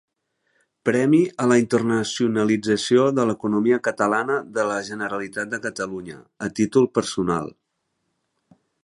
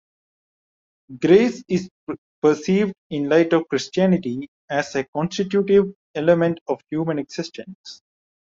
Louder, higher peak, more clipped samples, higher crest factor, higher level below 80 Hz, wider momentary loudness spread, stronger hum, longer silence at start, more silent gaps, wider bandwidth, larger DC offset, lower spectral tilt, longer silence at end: about the same, -22 LUFS vs -21 LUFS; about the same, -2 dBFS vs -2 dBFS; neither; about the same, 20 dB vs 18 dB; about the same, -60 dBFS vs -60 dBFS; second, 10 LU vs 16 LU; neither; second, 0.85 s vs 1.1 s; second, none vs 1.91-2.07 s, 2.18-2.42 s, 2.98-3.10 s, 4.48-4.68 s, 5.08-5.13 s, 5.95-6.14 s, 6.61-6.66 s, 7.75-7.84 s; first, 11.5 kHz vs 7.6 kHz; neither; about the same, -5.5 dB/octave vs -6.5 dB/octave; first, 1.35 s vs 0.55 s